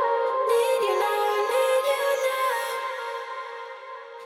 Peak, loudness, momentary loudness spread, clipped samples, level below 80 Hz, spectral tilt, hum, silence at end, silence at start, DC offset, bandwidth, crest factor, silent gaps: -12 dBFS; -24 LUFS; 15 LU; under 0.1%; under -90 dBFS; 0 dB/octave; none; 0 s; 0 s; under 0.1%; 18 kHz; 14 dB; none